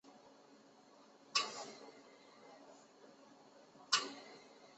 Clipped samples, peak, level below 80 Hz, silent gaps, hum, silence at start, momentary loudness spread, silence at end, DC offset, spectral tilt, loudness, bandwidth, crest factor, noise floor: under 0.1%; -18 dBFS; under -90 dBFS; none; none; 0.05 s; 27 LU; 0 s; under 0.1%; 2 dB/octave; -39 LUFS; 8 kHz; 30 dB; -64 dBFS